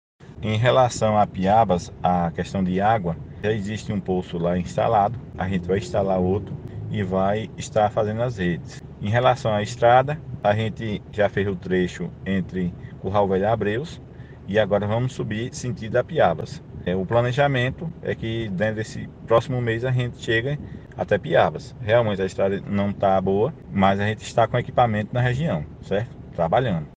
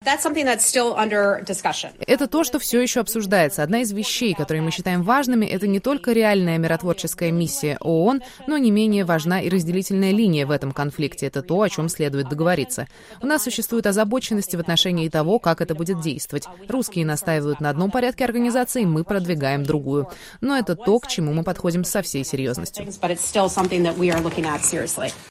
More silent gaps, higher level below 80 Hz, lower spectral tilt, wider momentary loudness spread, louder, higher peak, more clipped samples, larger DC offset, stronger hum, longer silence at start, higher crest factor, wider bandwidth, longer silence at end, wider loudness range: neither; about the same, -46 dBFS vs -50 dBFS; first, -6.5 dB/octave vs -4.5 dB/octave; first, 10 LU vs 7 LU; about the same, -23 LUFS vs -21 LUFS; about the same, -2 dBFS vs -2 dBFS; neither; neither; neither; first, 0.2 s vs 0 s; about the same, 20 dB vs 18 dB; second, 9.6 kHz vs 16 kHz; about the same, 0.05 s vs 0 s; about the same, 3 LU vs 3 LU